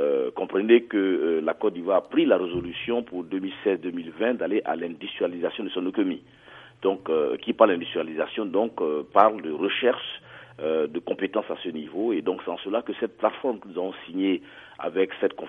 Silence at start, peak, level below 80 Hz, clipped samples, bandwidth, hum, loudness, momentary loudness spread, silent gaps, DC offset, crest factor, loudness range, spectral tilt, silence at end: 0 s; -2 dBFS; -64 dBFS; under 0.1%; 3.9 kHz; none; -26 LUFS; 11 LU; none; under 0.1%; 24 dB; 5 LU; -8 dB/octave; 0 s